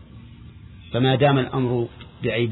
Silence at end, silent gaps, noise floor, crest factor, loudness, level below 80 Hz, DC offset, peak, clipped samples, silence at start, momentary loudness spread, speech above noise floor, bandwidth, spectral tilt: 0 s; none; -42 dBFS; 16 dB; -22 LUFS; -48 dBFS; under 0.1%; -6 dBFS; under 0.1%; 0 s; 11 LU; 22 dB; 4.1 kHz; -10.5 dB/octave